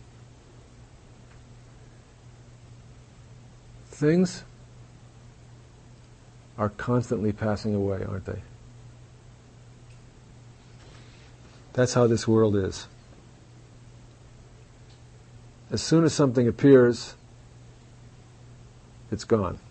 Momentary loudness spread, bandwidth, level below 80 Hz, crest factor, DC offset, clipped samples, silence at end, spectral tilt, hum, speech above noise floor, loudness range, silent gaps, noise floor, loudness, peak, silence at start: 22 LU; 8.8 kHz; -54 dBFS; 22 dB; under 0.1%; under 0.1%; 0.1 s; -6.5 dB/octave; none; 28 dB; 11 LU; none; -50 dBFS; -24 LUFS; -6 dBFS; 3.3 s